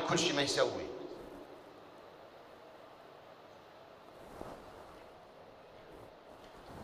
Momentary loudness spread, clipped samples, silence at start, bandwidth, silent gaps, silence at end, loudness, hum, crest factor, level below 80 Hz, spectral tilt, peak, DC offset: 24 LU; under 0.1%; 0 s; 15.5 kHz; none; 0 s; -36 LUFS; none; 24 dB; -68 dBFS; -3 dB/octave; -16 dBFS; under 0.1%